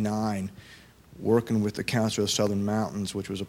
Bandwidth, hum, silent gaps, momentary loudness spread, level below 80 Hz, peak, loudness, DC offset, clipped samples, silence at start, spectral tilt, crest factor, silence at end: 16.5 kHz; none; none; 8 LU; -58 dBFS; -12 dBFS; -27 LUFS; under 0.1%; under 0.1%; 0 s; -5 dB/octave; 16 dB; 0 s